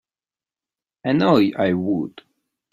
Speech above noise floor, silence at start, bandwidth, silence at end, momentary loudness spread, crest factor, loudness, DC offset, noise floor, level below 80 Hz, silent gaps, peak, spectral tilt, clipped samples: over 71 dB; 1.05 s; 12.5 kHz; 0.65 s; 12 LU; 20 dB; -20 LUFS; under 0.1%; under -90 dBFS; -60 dBFS; none; -2 dBFS; -8 dB/octave; under 0.1%